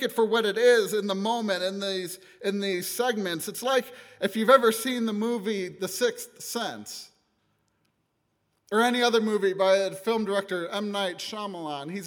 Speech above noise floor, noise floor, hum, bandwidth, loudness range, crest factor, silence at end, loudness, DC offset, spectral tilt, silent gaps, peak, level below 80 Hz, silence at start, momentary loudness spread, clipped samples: 49 dB; -75 dBFS; none; over 20 kHz; 6 LU; 22 dB; 0 s; -26 LUFS; under 0.1%; -3.5 dB/octave; none; -4 dBFS; -80 dBFS; 0 s; 13 LU; under 0.1%